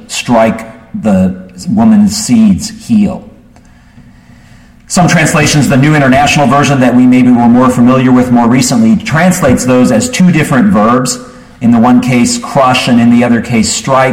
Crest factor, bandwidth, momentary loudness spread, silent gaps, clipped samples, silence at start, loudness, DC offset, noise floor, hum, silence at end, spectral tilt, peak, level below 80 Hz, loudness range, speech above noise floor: 8 dB; 16 kHz; 8 LU; none; under 0.1%; 0.1 s; -8 LUFS; under 0.1%; -39 dBFS; none; 0 s; -5.5 dB/octave; 0 dBFS; -36 dBFS; 5 LU; 32 dB